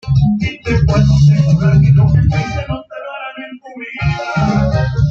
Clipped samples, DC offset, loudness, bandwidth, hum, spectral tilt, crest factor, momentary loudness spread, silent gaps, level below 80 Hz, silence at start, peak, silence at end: under 0.1%; under 0.1%; -13 LUFS; 7 kHz; none; -8 dB/octave; 10 dB; 17 LU; none; -26 dBFS; 0.05 s; -2 dBFS; 0 s